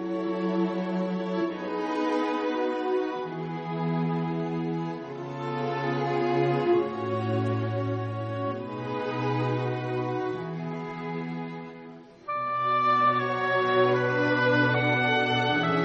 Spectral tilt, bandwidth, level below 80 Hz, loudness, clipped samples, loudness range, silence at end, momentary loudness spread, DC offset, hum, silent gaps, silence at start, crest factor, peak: -7.5 dB/octave; 8 kHz; -68 dBFS; -27 LUFS; under 0.1%; 7 LU; 0 s; 11 LU; under 0.1%; none; none; 0 s; 16 dB; -12 dBFS